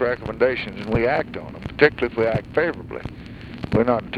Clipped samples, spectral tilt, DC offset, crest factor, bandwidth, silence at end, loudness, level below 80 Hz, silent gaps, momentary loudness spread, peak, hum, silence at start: under 0.1%; -8 dB/octave; under 0.1%; 20 dB; 6.8 kHz; 0 s; -22 LUFS; -42 dBFS; none; 15 LU; -2 dBFS; none; 0 s